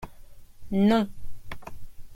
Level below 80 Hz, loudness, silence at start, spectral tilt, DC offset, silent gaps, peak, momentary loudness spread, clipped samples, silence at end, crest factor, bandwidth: -46 dBFS; -25 LUFS; 0 s; -7.5 dB/octave; under 0.1%; none; -10 dBFS; 24 LU; under 0.1%; 0 s; 18 dB; 15.5 kHz